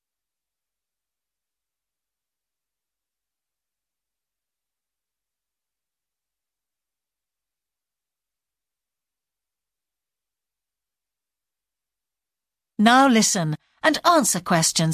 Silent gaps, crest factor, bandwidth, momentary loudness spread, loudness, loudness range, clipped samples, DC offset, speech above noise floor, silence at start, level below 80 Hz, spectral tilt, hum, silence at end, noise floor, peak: none; 24 dB; 16 kHz; 9 LU; -18 LUFS; 5 LU; under 0.1%; under 0.1%; 71 dB; 12.8 s; -68 dBFS; -3.5 dB/octave; none; 0 s; -90 dBFS; -4 dBFS